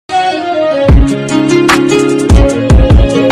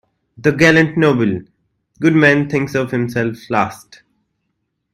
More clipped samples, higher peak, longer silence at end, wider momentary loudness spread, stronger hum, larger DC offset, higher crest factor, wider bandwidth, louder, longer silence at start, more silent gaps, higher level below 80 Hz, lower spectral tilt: neither; about the same, 0 dBFS vs 0 dBFS; second, 0 s vs 1.2 s; second, 5 LU vs 9 LU; neither; neither; second, 8 dB vs 16 dB; second, 13 kHz vs 15 kHz; first, -9 LUFS vs -15 LUFS; second, 0.1 s vs 0.4 s; neither; first, -12 dBFS vs -52 dBFS; about the same, -6 dB/octave vs -6.5 dB/octave